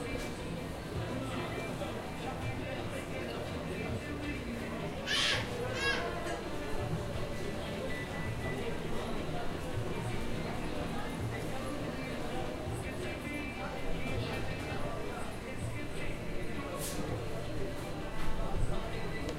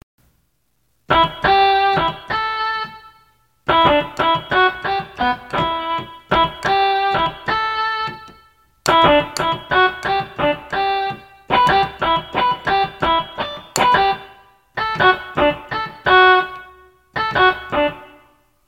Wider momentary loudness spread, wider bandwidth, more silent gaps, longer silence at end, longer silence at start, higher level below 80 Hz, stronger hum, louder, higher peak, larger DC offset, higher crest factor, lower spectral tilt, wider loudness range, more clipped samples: second, 6 LU vs 11 LU; about the same, 16 kHz vs 16.5 kHz; neither; second, 0 s vs 0.6 s; second, 0 s vs 1.1 s; about the same, -44 dBFS vs -44 dBFS; neither; second, -38 LUFS vs -17 LUFS; second, -18 dBFS vs 0 dBFS; neither; about the same, 18 dB vs 18 dB; about the same, -5 dB/octave vs -4 dB/octave; about the same, 4 LU vs 3 LU; neither